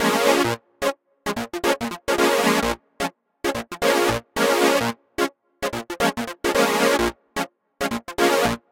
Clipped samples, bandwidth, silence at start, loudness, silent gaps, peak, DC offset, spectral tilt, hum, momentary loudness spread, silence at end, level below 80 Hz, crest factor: under 0.1%; 17 kHz; 0 s; -22 LUFS; none; -2 dBFS; under 0.1%; -3.5 dB/octave; none; 11 LU; 0.15 s; -48 dBFS; 20 dB